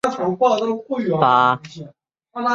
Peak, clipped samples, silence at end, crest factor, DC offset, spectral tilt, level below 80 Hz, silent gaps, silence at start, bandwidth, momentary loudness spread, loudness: 0 dBFS; under 0.1%; 0 s; 18 dB; under 0.1%; -6 dB/octave; -66 dBFS; none; 0.05 s; 11 kHz; 21 LU; -18 LUFS